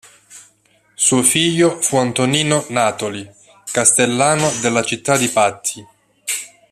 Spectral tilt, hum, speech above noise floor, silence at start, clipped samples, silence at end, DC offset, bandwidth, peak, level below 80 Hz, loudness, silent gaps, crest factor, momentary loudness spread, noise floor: -3 dB/octave; none; 40 dB; 0.3 s; under 0.1%; 0.25 s; under 0.1%; 15 kHz; 0 dBFS; -58 dBFS; -16 LUFS; none; 18 dB; 12 LU; -57 dBFS